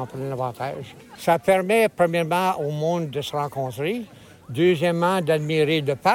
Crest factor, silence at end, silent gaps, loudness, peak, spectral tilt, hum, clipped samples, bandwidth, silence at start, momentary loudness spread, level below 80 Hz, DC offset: 16 dB; 0 s; none; -22 LUFS; -8 dBFS; -6 dB/octave; none; under 0.1%; 17 kHz; 0 s; 12 LU; -62 dBFS; under 0.1%